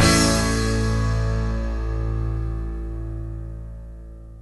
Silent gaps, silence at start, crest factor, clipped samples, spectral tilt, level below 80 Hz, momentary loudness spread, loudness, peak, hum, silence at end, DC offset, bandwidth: none; 0 s; 18 dB; under 0.1%; -4.5 dB/octave; -28 dBFS; 19 LU; -24 LUFS; -4 dBFS; 60 Hz at -55 dBFS; 0 s; under 0.1%; 12 kHz